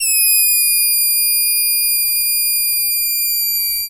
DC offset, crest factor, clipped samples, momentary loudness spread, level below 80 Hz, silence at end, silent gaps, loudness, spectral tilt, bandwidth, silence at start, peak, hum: under 0.1%; 12 dB; under 0.1%; 4 LU; -50 dBFS; 0 s; none; -12 LUFS; 6 dB/octave; 16 kHz; 0 s; -4 dBFS; none